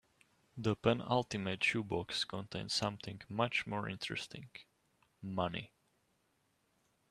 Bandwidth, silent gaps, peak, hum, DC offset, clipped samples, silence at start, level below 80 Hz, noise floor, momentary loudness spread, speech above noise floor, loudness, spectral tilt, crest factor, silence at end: 13.5 kHz; none; -14 dBFS; none; under 0.1%; under 0.1%; 0.55 s; -68 dBFS; -78 dBFS; 17 LU; 40 dB; -37 LUFS; -4.5 dB/octave; 24 dB; 1.45 s